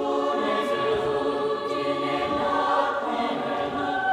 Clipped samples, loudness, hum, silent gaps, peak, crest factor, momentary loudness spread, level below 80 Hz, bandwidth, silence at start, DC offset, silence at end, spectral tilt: under 0.1%; -25 LUFS; none; none; -10 dBFS; 14 dB; 4 LU; -58 dBFS; 13.5 kHz; 0 s; under 0.1%; 0 s; -5 dB/octave